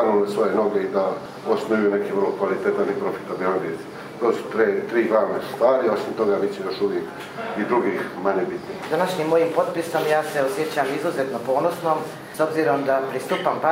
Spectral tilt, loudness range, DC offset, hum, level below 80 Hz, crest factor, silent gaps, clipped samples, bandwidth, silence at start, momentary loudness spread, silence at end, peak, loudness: -5.5 dB/octave; 2 LU; under 0.1%; none; -68 dBFS; 18 dB; none; under 0.1%; 16 kHz; 0 s; 6 LU; 0 s; -4 dBFS; -22 LUFS